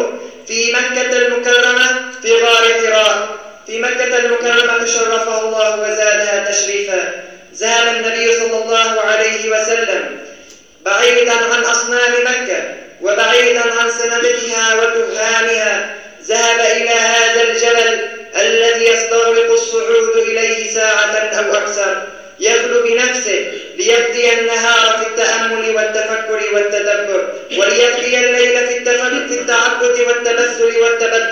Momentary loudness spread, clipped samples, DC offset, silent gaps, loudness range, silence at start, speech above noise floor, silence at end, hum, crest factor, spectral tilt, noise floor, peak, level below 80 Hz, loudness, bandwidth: 8 LU; under 0.1%; 0.3%; none; 2 LU; 0 s; 27 dB; 0 s; none; 14 dB; 0.5 dB/octave; -41 dBFS; 0 dBFS; -62 dBFS; -12 LUFS; 8.8 kHz